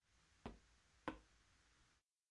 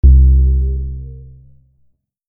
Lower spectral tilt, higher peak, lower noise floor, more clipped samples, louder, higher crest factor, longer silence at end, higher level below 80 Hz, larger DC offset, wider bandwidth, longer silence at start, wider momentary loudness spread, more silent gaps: second, -5 dB/octave vs -16 dB/octave; second, -32 dBFS vs 0 dBFS; first, -80 dBFS vs -59 dBFS; neither; second, -57 LUFS vs -13 LUFS; first, 30 dB vs 12 dB; second, 0.45 s vs 1.1 s; second, -72 dBFS vs -14 dBFS; neither; first, 10.5 kHz vs 0.5 kHz; first, 0.3 s vs 0.05 s; second, 10 LU vs 21 LU; neither